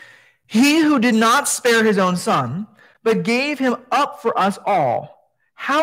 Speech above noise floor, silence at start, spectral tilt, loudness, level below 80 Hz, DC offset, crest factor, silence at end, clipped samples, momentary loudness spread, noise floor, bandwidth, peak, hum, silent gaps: 30 dB; 0.5 s; -4 dB/octave; -17 LUFS; -68 dBFS; under 0.1%; 14 dB; 0 s; under 0.1%; 10 LU; -47 dBFS; 16 kHz; -4 dBFS; none; none